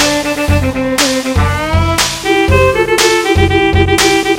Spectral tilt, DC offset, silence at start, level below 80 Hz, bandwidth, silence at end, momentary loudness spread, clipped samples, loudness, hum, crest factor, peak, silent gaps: -4 dB/octave; under 0.1%; 0 s; -24 dBFS; 17 kHz; 0 s; 4 LU; under 0.1%; -11 LUFS; none; 10 dB; 0 dBFS; none